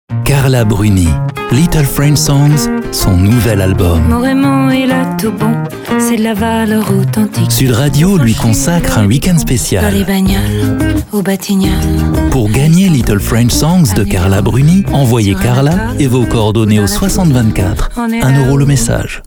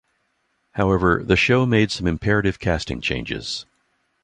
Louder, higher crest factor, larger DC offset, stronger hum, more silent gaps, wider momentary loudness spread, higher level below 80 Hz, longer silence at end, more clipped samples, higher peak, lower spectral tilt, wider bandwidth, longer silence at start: first, -11 LUFS vs -20 LUFS; second, 10 dB vs 20 dB; neither; neither; neither; second, 5 LU vs 10 LU; first, -22 dBFS vs -38 dBFS; second, 0.05 s vs 0.6 s; neither; about the same, 0 dBFS vs -2 dBFS; about the same, -6 dB/octave vs -6 dB/octave; first, over 20 kHz vs 10 kHz; second, 0.1 s vs 0.75 s